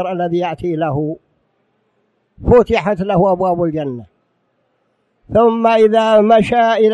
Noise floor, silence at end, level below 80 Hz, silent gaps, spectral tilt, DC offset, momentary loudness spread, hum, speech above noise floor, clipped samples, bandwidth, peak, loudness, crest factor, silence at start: -64 dBFS; 0 s; -38 dBFS; none; -7.5 dB/octave; under 0.1%; 13 LU; none; 51 dB; under 0.1%; 9.6 kHz; -2 dBFS; -14 LUFS; 14 dB; 0 s